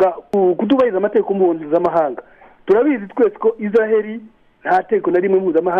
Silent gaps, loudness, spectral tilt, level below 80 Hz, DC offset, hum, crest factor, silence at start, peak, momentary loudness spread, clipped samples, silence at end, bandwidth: none; -16 LUFS; -8.5 dB/octave; -58 dBFS; under 0.1%; none; 12 dB; 0 s; -4 dBFS; 7 LU; under 0.1%; 0 s; 5.4 kHz